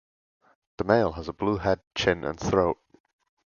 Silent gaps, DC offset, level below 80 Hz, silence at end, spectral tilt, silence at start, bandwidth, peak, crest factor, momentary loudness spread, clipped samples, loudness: 1.87-1.91 s; under 0.1%; -48 dBFS; 0.85 s; -5.5 dB/octave; 0.8 s; 7.2 kHz; -4 dBFS; 22 dB; 7 LU; under 0.1%; -26 LUFS